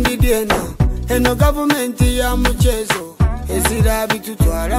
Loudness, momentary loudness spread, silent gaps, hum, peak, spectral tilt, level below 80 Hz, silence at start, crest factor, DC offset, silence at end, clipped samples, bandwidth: -17 LUFS; 5 LU; none; none; -2 dBFS; -5 dB/octave; -20 dBFS; 0 s; 14 dB; under 0.1%; 0 s; under 0.1%; 16.5 kHz